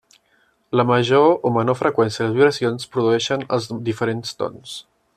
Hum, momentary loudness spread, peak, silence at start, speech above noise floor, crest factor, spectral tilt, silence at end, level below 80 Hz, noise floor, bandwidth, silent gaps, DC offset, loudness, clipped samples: none; 12 LU; -2 dBFS; 0.7 s; 43 dB; 18 dB; -5.5 dB/octave; 0.35 s; -62 dBFS; -62 dBFS; 13 kHz; none; under 0.1%; -19 LUFS; under 0.1%